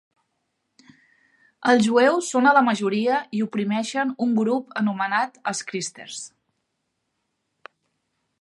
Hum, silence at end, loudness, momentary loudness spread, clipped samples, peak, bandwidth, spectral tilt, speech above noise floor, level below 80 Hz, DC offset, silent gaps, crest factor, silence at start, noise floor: none; 2.15 s; -22 LUFS; 13 LU; under 0.1%; -4 dBFS; 11.5 kHz; -4.5 dB/octave; 55 dB; -74 dBFS; under 0.1%; none; 20 dB; 1.6 s; -77 dBFS